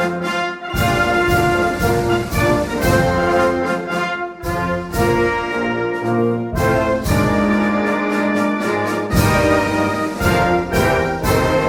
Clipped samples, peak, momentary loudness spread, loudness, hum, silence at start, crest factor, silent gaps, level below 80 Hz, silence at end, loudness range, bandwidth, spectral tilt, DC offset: under 0.1%; -2 dBFS; 5 LU; -17 LUFS; none; 0 s; 14 dB; none; -32 dBFS; 0 s; 2 LU; 17.5 kHz; -6 dB/octave; under 0.1%